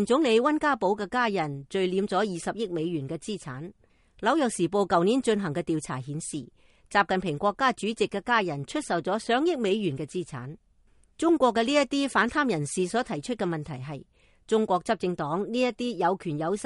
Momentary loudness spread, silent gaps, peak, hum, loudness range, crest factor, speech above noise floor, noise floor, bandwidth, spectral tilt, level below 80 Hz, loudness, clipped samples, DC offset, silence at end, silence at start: 11 LU; none; -8 dBFS; none; 3 LU; 18 dB; 34 dB; -61 dBFS; 11.5 kHz; -5 dB/octave; -60 dBFS; -27 LUFS; under 0.1%; under 0.1%; 0 s; 0 s